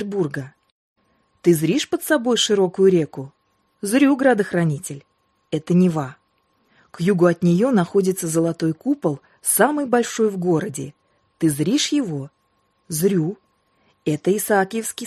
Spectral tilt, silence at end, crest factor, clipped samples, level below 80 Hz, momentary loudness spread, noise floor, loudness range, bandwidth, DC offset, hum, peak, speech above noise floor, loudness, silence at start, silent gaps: -5 dB/octave; 0 s; 18 dB; under 0.1%; -64 dBFS; 14 LU; -66 dBFS; 4 LU; 13 kHz; under 0.1%; none; -2 dBFS; 47 dB; -20 LUFS; 0 s; 0.72-0.96 s